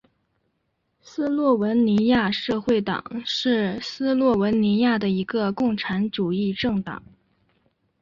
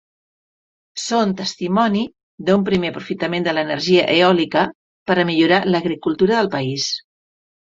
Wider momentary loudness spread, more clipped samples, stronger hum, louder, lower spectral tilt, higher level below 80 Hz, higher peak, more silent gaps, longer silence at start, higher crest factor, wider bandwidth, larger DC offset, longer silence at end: about the same, 8 LU vs 10 LU; neither; neither; second, -22 LUFS vs -18 LUFS; first, -6.5 dB/octave vs -5 dB/octave; about the same, -56 dBFS vs -56 dBFS; second, -8 dBFS vs -2 dBFS; second, none vs 2.23-2.38 s, 4.75-5.06 s; first, 1.1 s vs 0.95 s; about the same, 14 dB vs 18 dB; about the same, 7.4 kHz vs 7.8 kHz; neither; first, 1 s vs 0.65 s